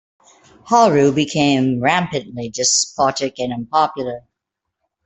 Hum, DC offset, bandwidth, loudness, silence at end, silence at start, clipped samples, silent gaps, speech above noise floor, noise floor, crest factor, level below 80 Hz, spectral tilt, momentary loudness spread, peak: none; under 0.1%; 8.4 kHz; -17 LUFS; 0.85 s; 0.65 s; under 0.1%; none; 63 dB; -80 dBFS; 16 dB; -56 dBFS; -3.5 dB/octave; 12 LU; -2 dBFS